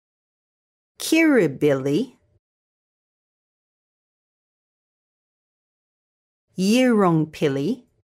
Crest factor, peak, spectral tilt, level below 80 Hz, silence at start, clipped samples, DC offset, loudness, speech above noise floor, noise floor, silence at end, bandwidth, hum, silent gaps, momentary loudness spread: 18 dB; -6 dBFS; -5.5 dB/octave; -68 dBFS; 1 s; under 0.1%; under 0.1%; -20 LUFS; over 71 dB; under -90 dBFS; 0.35 s; 16 kHz; none; 2.39-6.48 s; 11 LU